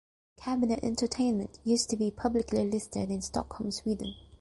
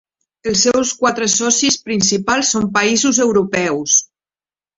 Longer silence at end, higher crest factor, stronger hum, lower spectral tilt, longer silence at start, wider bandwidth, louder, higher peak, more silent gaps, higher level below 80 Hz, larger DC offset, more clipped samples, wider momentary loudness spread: second, 0.2 s vs 0.7 s; about the same, 16 dB vs 16 dB; neither; first, -5 dB/octave vs -2 dB/octave; about the same, 0.4 s vs 0.45 s; first, 11.5 kHz vs 8.2 kHz; second, -31 LUFS vs -14 LUFS; second, -16 dBFS vs -2 dBFS; neither; about the same, -52 dBFS vs -52 dBFS; neither; neither; about the same, 6 LU vs 4 LU